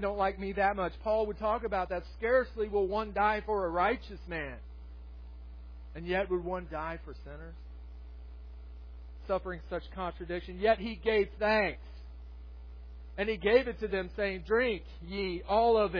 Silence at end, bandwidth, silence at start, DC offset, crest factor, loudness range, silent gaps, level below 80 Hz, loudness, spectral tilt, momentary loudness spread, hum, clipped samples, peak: 0 s; 5.4 kHz; 0 s; under 0.1%; 20 dB; 9 LU; none; -46 dBFS; -32 LUFS; -7.5 dB/octave; 21 LU; 60 Hz at -45 dBFS; under 0.1%; -12 dBFS